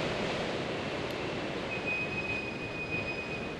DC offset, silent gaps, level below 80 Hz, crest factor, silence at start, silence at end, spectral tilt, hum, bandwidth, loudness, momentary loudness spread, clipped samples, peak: under 0.1%; none; -54 dBFS; 14 dB; 0 s; 0 s; -5 dB/octave; none; 12.5 kHz; -34 LUFS; 4 LU; under 0.1%; -22 dBFS